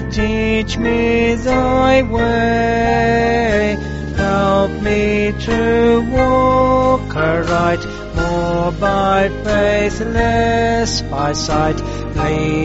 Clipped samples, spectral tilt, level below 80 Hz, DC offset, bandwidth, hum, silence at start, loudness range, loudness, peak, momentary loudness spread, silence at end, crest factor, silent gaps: under 0.1%; -5 dB/octave; -26 dBFS; under 0.1%; 8 kHz; none; 0 s; 2 LU; -15 LUFS; -2 dBFS; 6 LU; 0 s; 14 dB; none